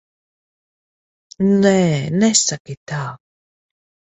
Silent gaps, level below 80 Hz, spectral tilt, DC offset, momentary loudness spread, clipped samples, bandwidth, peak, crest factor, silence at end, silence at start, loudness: 2.60-2.65 s, 2.77-2.86 s; -58 dBFS; -4.5 dB/octave; under 0.1%; 14 LU; under 0.1%; 8.4 kHz; -2 dBFS; 18 dB; 0.95 s; 1.4 s; -16 LUFS